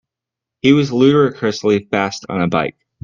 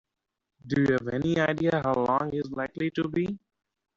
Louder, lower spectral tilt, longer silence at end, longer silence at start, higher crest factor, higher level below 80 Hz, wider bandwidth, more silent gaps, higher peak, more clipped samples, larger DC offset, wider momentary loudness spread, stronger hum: first, -16 LUFS vs -27 LUFS; about the same, -6 dB/octave vs -6 dB/octave; second, 0.35 s vs 0.6 s; about the same, 0.65 s vs 0.65 s; about the same, 16 dB vs 18 dB; first, -54 dBFS vs -60 dBFS; about the same, 7.4 kHz vs 7.6 kHz; neither; first, 0 dBFS vs -10 dBFS; neither; neither; about the same, 8 LU vs 7 LU; neither